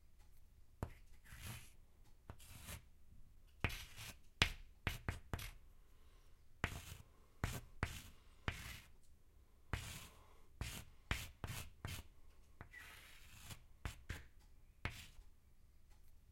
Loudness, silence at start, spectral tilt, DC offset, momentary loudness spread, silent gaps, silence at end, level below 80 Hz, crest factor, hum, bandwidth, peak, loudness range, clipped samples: -49 LUFS; 0 s; -3.5 dB/octave; under 0.1%; 20 LU; none; 0 s; -58 dBFS; 42 dB; none; 16.5 kHz; -10 dBFS; 10 LU; under 0.1%